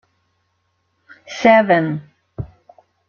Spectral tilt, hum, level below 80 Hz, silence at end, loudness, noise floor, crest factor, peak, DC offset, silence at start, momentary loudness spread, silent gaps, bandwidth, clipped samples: -6.5 dB/octave; none; -52 dBFS; 0.65 s; -15 LUFS; -68 dBFS; 18 dB; -2 dBFS; under 0.1%; 1.3 s; 22 LU; none; 7 kHz; under 0.1%